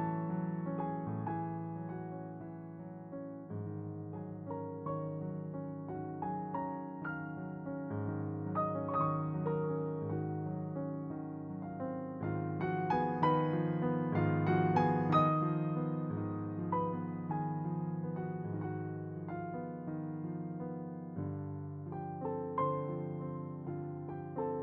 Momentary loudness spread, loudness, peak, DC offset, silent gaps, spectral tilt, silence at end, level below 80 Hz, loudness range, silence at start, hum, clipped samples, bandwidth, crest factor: 12 LU; -38 LUFS; -18 dBFS; under 0.1%; none; -8.5 dB/octave; 0 s; -70 dBFS; 10 LU; 0 s; none; under 0.1%; 5.4 kHz; 20 dB